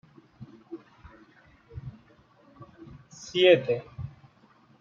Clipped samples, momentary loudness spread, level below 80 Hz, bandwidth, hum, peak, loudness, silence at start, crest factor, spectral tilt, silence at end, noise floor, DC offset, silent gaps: under 0.1%; 30 LU; -60 dBFS; 7.4 kHz; none; -6 dBFS; -23 LUFS; 0.4 s; 26 dB; -5 dB/octave; 0.7 s; -60 dBFS; under 0.1%; none